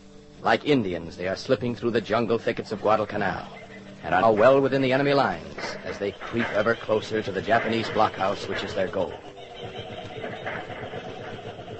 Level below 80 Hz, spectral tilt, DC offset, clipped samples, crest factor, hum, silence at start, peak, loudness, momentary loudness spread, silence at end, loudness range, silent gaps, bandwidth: -54 dBFS; -6 dB/octave; under 0.1%; under 0.1%; 20 dB; none; 0 s; -4 dBFS; -25 LUFS; 16 LU; 0 s; 6 LU; none; 8.4 kHz